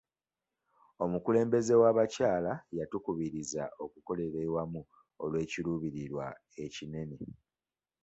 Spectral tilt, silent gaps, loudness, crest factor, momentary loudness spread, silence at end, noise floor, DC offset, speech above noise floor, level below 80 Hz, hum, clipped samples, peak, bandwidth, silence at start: -6 dB/octave; none; -33 LUFS; 20 dB; 16 LU; 0.7 s; under -90 dBFS; under 0.1%; over 58 dB; -64 dBFS; none; under 0.1%; -14 dBFS; 8.2 kHz; 1 s